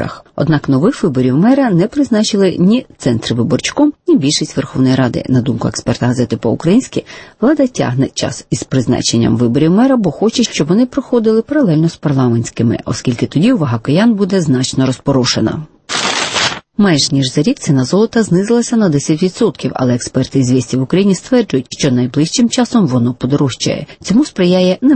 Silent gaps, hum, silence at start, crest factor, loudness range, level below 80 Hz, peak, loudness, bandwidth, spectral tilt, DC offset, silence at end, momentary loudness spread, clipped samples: none; none; 0 s; 12 dB; 2 LU; -44 dBFS; 0 dBFS; -13 LUFS; 8.8 kHz; -5.5 dB/octave; under 0.1%; 0 s; 5 LU; under 0.1%